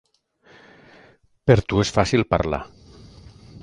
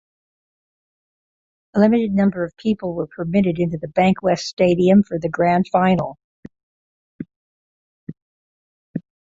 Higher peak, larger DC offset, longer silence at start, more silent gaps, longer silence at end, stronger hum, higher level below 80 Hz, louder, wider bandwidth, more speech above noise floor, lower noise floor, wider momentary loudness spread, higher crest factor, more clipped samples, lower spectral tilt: about the same, 0 dBFS vs -2 dBFS; neither; second, 1.45 s vs 1.75 s; second, none vs 4.53-4.57 s, 6.24-6.43 s, 6.63-7.19 s, 7.36-8.07 s, 8.22-8.94 s; second, 0.05 s vs 0.4 s; neither; first, -40 dBFS vs -54 dBFS; second, -21 LUFS vs -18 LUFS; first, 11 kHz vs 7.8 kHz; second, 38 dB vs over 72 dB; second, -57 dBFS vs under -90 dBFS; second, 10 LU vs 21 LU; first, 24 dB vs 18 dB; neither; second, -6 dB/octave vs -7.5 dB/octave